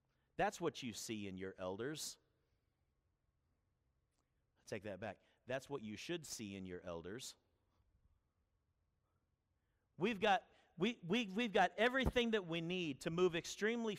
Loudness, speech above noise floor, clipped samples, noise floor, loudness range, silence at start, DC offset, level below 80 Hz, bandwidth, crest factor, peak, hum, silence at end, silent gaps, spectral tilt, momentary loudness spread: -41 LUFS; 44 dB; under 0.1%; -85 dBFS; 16 LU; 0.4 s; under 0.1%; -62 dBFS; 15.5 kHz; 20 dB; -22 dBFS; none; 0 s; none; -4.5 dB/octave; 14 LU